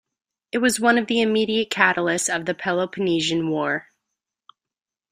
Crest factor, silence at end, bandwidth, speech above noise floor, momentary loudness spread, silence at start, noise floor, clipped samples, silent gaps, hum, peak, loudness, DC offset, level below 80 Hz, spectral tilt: 22 dB; 1.3 s; 15 kHz; 68 dB; 6 LU; 0.55 s; -89 dBFS; under 0.1%; none; none; -2 dBFS; -21 LUFS; under 0.1%; -64 dBFS; -3.5 dB/octave